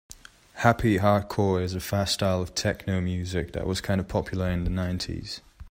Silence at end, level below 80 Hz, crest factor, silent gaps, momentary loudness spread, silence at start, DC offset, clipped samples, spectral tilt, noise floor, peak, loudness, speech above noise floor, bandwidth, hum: 0 s; -44 dBFS; 20 dB; none; 9 LU; 0.55 s; under 0.1%; under 0.1%; -5.5 dB/octave; -47 dBFS; -6 dBFS; -26 LUFS; 21 dB; 16 kHz; none